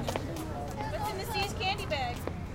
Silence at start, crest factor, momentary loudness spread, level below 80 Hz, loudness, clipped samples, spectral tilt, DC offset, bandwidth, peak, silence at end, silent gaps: 0 s; 20 dB; 6 LU; -44 dBFS; -34 LUFS; under 0.1%; -4.5 dB/octave; under 0.1%; 17 kHz; -14 dBFS; 0 s; none